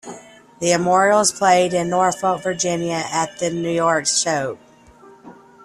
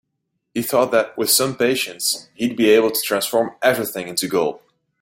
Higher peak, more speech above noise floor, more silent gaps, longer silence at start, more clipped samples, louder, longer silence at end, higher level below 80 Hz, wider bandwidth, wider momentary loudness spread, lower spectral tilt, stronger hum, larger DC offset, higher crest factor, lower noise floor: about the same, -2 dBFS vs -2 dBFS; second, 28 dB vs 56 dB; neither; second, 0.05 s vs 0.55 s; neither; about the same, -18 LUFS vs -19 LUFS; second, 0.3 s vs 0.45 s; about the same, -60 dBFS vs -62 dBFS; second, 13.5 kHz vs 16.5 kHz; about the same, 9 LU vs 8 LU; about the same, -3 dB/octave vs -2.5 dB/octave; neither; neither; about the same, 16 dB vs 18 dB; second, -47 dBFS vs -75 dBFS